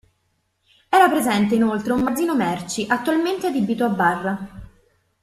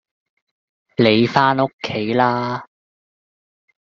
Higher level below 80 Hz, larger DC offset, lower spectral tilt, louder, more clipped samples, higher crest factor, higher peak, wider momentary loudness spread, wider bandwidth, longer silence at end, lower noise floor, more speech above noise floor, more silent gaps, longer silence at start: first, -54 dBFS vs -60 dBFS; neither; about the same, -5 dB/octave vs -4 dB/octave; second, -20 LUFS vs -17 LUFS; neither; about the same, 18 dB vs 20 dB; about the same, -2 dBFS vs -2 dBFS; second, 9 LU vs 12 LU; first, 14 kHz vs 7.2 kHz; second, 0.6 s vs 1.2 s; second, -69 dBFS vs under -90 dBFS; second, 50 dB vs over 73 dB; second, none vs 1.73-1.78 s; about the same, 0.9 s vs 1 s